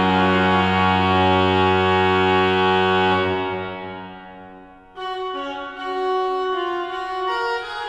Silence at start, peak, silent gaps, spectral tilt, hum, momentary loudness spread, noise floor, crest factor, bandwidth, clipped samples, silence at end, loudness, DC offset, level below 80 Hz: 0 s; -6 dBFS; none; -6.5 dB/octave; none; 13 LU; -43 dBFS; 14 dB; 9.4 kHz; under 0.1%; 0 s; -19 LUFS; under 0.1%; -56 dBFS